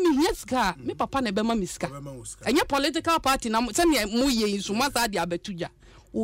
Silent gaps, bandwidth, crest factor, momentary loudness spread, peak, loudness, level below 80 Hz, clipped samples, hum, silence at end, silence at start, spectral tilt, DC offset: none; 16 kHz; 14 dB; 12 LU; -12 dBFS; -25 LUFS; -46 dBFS; under 0.1%; none; 0 s; 0 s; -3.5 dB/octave; under 0.1%